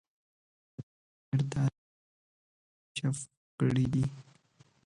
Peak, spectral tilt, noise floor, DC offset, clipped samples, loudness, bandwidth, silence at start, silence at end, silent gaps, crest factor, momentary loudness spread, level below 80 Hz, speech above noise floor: -16 dBFS; -6.5 dB/octave; -65 dBFS; under 0.1%; under 0.1%; -33 LUFS; 11 kHz; 0.8 s; 0.65 s; 0.83-1.32 s, 1.78-2.95 s, 3.37-3.58 s; 20 dB; 21 LU; -60 dBFS; 35 dB